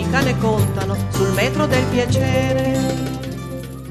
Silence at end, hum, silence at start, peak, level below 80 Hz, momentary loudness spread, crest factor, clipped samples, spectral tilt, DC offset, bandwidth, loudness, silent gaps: 0 s; none; 0 s; -2 dBFS; -36 dBFS; 10 LU; 16 dB; under 0.1%; -6 dB/octave; under 0.1%; 14 kHz; -19 LUFS; none